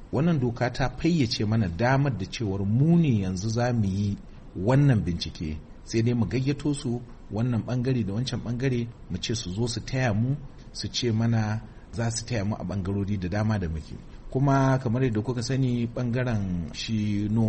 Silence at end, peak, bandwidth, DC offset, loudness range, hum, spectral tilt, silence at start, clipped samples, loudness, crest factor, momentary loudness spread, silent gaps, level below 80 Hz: 0 s; -10 dBFS; 8.4 kHz; under 0.1%; 4 LU; none; -6.5 dB/octave; 0 s; under 0.1%; -27 LUFS; 16 dB; 11 LU; none; -44 dBFS